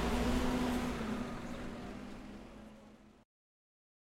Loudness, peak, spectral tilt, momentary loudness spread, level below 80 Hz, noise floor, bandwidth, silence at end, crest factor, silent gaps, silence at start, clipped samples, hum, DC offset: -38 LUFS; -20 dBFS; -5.5 dB/octave; 20 LU; -46 dBFS; -58 dBFS; 16.5 kHz; 0.95 s; 18 dB; none; 0 s; under 0.1%; none; under 0.1%